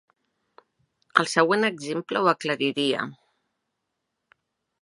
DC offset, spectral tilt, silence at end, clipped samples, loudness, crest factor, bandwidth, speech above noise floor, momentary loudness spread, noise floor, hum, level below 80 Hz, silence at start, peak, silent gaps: under 0.1%; -4 dB/octave; 1.7 s; under 0.1%; -24 LUFS; 26 dB; 11.5 kHz; 56 dB; 9 LU; -80 dBFS; none; -80 dBFS; 1.15 s; -2 dBFS; none